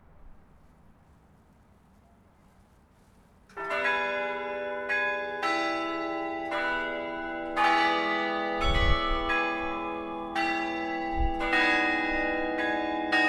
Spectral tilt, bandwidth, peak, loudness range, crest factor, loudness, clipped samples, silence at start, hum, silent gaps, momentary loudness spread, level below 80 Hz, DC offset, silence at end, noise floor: -5 dB/octave; 12 kHz; -10 dBFS; 6 LU; 20 dB; -28 LUFS; under 0.1%; 0.2 s; none; none; 9 LU; -40 dBFS; under 0.1%; 0 s; -59 dBFS